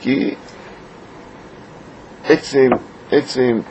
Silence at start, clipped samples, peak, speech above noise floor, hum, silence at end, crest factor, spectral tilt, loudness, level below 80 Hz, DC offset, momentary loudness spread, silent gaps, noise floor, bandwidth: 0 s; under 0.1%; 0 dBFS; 23 dB; none; 0 s; 18 dB; -5.5 dB/octave; -17 LUFS; -52 dBFS; under 0.1%; 24 LU; none; -38 dBFS; 8.4 kHz